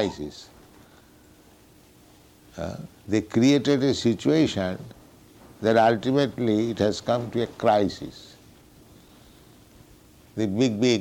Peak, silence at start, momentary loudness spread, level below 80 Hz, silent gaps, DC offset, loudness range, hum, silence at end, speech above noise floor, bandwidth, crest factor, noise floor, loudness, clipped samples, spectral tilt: -10 dBFS; 0 s; 18 LU; -56 dBFS; none; under 0.1%; 7 LU; none; 0 s; 31 dB; 16.5 kHz; 16 dB; -54 dBFS; -23 LUFS; under 0.1%; -6 dB/octave